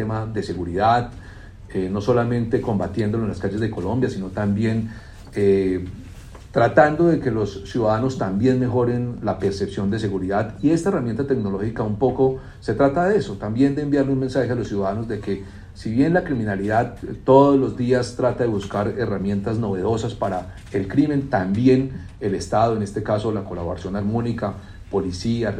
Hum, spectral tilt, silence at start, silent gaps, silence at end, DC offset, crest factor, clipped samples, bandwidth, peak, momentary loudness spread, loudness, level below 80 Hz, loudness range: none; -7.5 dB/octave; 0 s; none; 0 s; under 0.1%; 20 dB; under 0.1%; 10.5 kHz; -2 dBFS; 10 LU; -21 LUFS; -44 dBFS; 3 LU